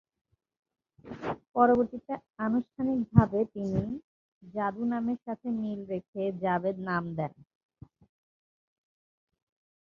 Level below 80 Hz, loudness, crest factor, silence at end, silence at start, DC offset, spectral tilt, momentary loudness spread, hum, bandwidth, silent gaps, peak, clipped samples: -54 dBFS; -30 LUFS; 26 dB; 2.5 s; 1.05 s; under 0.1%; -10 dB/octave; 14 LU; none; 6.2 kHz; 1.49-1.54 s, 2.30-2.34 s, 4.04-4.41 s, 6.08-6.13 s; -6 dBFS; under 0.1%